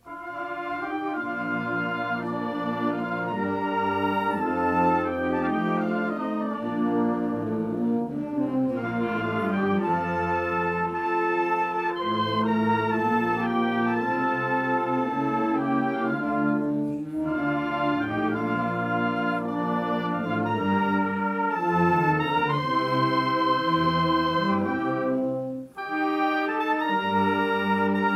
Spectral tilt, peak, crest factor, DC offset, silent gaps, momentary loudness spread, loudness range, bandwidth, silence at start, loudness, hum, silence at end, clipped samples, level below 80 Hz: -7.5 dB/octave; -10 dBFS; 14 dB; under 0.1%; none; 5 LU; 3 LU; 14 kHz; 0.05 s; -25 LUFS; none; 0 s; under 0.1%; -60 dBFS